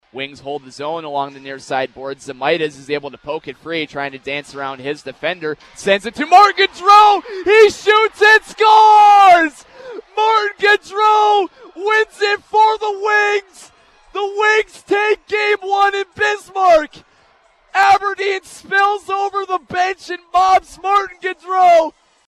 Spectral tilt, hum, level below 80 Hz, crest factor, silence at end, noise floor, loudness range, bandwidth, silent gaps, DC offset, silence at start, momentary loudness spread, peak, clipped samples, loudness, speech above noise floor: -2.5 dB/octave; none; -54 dBFS; 14 dB; 0.4 s; -53 dBFS; 12 LU; 13.5 kHz; none; under 0.1%; 0.15 s; 17 LU; 0 dBFS; under 0.1%; -14 LUFS; 39 dB